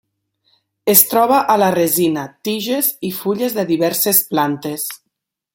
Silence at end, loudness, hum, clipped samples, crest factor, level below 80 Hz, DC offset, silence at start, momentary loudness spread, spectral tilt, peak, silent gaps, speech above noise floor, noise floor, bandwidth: 0.6 s; -15 LUFS; none; under 0.1%; 18 dB; -62 dBFS; under 0.1%; 0.85 s; 12 LU; -3.5 dB/octave; 0 dBFS; none; 60 dB; -76 dBFS; 17 kHz